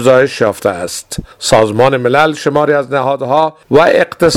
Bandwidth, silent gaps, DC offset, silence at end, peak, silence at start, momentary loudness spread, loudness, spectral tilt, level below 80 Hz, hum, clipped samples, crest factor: 16 kHz; none; under 0.1%; 0 s; 0 dBFS; 0 s; 10 LU; -11 LUFS; -4.5 dB/octave; -40 dBFS; none; 0.4%; 12 dB